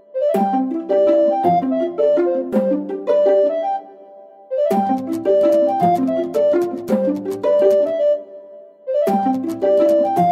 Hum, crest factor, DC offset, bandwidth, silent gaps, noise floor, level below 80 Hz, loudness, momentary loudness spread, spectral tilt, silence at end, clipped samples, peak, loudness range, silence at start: none; 14 dB; under 0.1%; 15 kHz; none; -42 dBFS; -64 dBFS; -17 LUFS; 7 LU; -8 dB/octave; 0 s; under 0.1%; -4 dBFS; 2 LU; 0.15 s